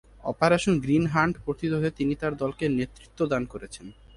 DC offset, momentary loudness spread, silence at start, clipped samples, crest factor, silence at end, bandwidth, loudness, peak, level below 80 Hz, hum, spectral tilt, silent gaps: under 0.1%; 13 LU; 0.25 s; under 0.1%; 20 dB; 0.25 s; 11.5 kHz; -26 LUFS; -6 dBFS; -50 dBFS; none; -6.5 dB/octave; none